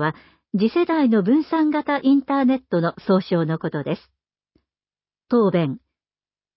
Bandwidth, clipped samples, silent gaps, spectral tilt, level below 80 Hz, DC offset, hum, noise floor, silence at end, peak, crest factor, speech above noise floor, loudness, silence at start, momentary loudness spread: 5.8 kHz; under 0.1%; none; -12 dB/octave; -64 dBFS; under 0.1%; none; under -90 dBFS; 0.8 s; -8 dBFS; 14 dB; over 70 dB; -21 LUFS; 0 s; 9 LU